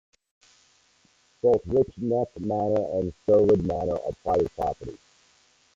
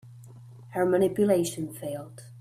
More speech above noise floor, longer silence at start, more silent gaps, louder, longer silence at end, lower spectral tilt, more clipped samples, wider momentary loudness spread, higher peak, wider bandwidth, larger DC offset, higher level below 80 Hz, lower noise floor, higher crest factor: first, 39 dB vs 21 dB; first, 1.45 s vs 0.05 s; neither; about the same, -25 LUFS vs -27 LUFS; first, 0.8 s vs 0 s; first, -9 dB/octave vs -6 dB/octave; neither; second, 9 LU vs 14 LU; about the same, -10 dBFS vs -10 dBFS; second, 7.6 kHz vs 15.5 kHz; neither; first, -52 dBFS vs -66 dBFS; first, -63 dBFS vs -47 dBFS; about the same, 16 dB vs 18 dB